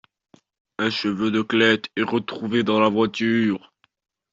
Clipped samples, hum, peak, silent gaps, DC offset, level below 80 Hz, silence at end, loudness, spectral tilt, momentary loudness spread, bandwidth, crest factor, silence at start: under 0.1%; none; -4 dBFS; none; under 0.1%; -64 dBFS; 0.75 s; -21 LUFS; -5.5 dB/octave; 7 LU; 7.6 kHz; 18 dB; 0.8 s